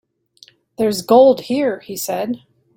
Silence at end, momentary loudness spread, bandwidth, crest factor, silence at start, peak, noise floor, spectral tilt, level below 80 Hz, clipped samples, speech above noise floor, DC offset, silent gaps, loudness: 0.4 s; 14 LU; 16.5 kHz; 16 dB; 0.8 s; -2 dBFS; -50 dBFS; -4.5 dB/octave; -62 dBFS; under 0.1%; 35 dB; under 0.1%; none; -16 LUFS